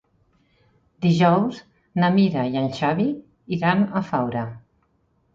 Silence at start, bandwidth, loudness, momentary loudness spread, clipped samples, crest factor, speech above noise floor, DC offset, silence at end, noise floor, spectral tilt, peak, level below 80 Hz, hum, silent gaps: 1 s; 7.6 kHz; -22 LUFS; 12 LU; under 0.1%; 18 dB; 45 dB; under 0.1%; 0.75 s; -66 dBFS; -8 dB/octave; -4 dBFS; -60 dBFS; none; none